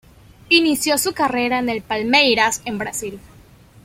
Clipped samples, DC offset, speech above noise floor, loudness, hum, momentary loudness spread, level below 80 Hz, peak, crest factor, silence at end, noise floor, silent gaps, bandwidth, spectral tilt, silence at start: under 0.1%; under 0.1%; 28 dB; -17 LUFS; none; 11 LU; -52 dBFS; -2 dBFS; 18 dB; 0.65 s; -47 dBFS; none; 16.5 kHz; -2 dB/octave; 0.5 s